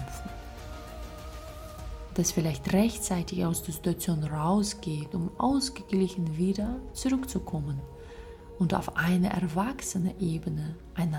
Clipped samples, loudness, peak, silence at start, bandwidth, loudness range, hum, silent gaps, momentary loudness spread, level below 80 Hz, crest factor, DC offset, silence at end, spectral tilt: under 0.1%; -30 LUFS; -12 dBFS; 0 s; 17 kHz; 2 LU; none; none; 16 LU; -46 dBFS; 18 dB; under 0.1%; 0 s; -5.5 dB/octave